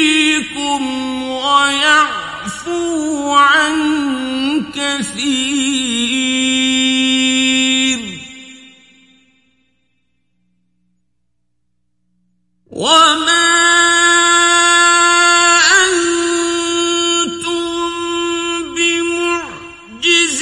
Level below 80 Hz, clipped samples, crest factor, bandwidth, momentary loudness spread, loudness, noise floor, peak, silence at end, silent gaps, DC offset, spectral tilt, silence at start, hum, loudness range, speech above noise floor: -52 dBFS; under 0.1%; 14 dB; 11.5 kHz; 11 LU; -12 LUFS; -71 dBFS; 0 dBFS; 0 s; none; under 0.1%; -0.5 dB/octave; 0 s; 60 Hz at -65 dBFS; 8 LU; 57 dB